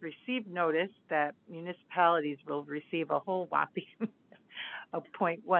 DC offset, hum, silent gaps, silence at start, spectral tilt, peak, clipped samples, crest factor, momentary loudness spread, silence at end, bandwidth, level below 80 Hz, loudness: under 0.1%; none; none; 0 s; -8.5 dB/octave; -12 dBFS; under 0.1%; 20 dB; 13 LU; 0 s; 4.3 kHz; -88 dBFS; -33 LUFS